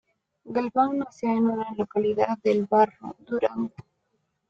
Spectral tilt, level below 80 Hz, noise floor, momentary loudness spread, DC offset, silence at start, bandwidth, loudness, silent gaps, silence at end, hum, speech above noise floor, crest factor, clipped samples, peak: -7.5 dB/octave; -66 dBFS; -75 dBFS; 10 LU; under 0.1%; 0.45 s; 7.4 kHz; -25 LUFS; none; 0.7 s; none; 50 dB; 18 dB; under 0.1%; -8 dBFS